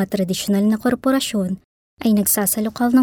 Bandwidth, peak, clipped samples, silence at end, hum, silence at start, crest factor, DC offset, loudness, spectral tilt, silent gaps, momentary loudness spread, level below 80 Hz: 19.5 kHz; -6 dBFS; under 0.1%; 0 s; none; 0 s; 12 dB; under 0.1%; -19 LUFS; -4.5 dB/octave; 1.64-1.97 s; 8 LU; -52 dBFS